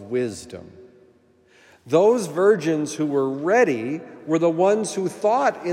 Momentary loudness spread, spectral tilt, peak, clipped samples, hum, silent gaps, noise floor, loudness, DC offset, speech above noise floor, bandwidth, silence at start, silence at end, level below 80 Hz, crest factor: 12 LU; -5.5 dB/octave; -4 dBFS; under 0.1%; none; none; -57 dBFS; -21 LUFS; under 0.1%; 36 dB; 14.5 kHz; 0 s; 0 s; -72 dBFS; 18 dB